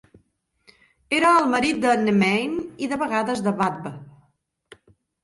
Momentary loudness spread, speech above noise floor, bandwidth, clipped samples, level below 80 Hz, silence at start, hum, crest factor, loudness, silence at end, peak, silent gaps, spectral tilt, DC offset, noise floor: 11 LU; 46 dB; 11.5 kHz; under 0.1%; -60 dBFS; 1.1 s; none; 18 dB; -21 LUFS; 1.15 s; -6 dBFS; none; -5 dB/octave; under 0.1%; -67 dBFS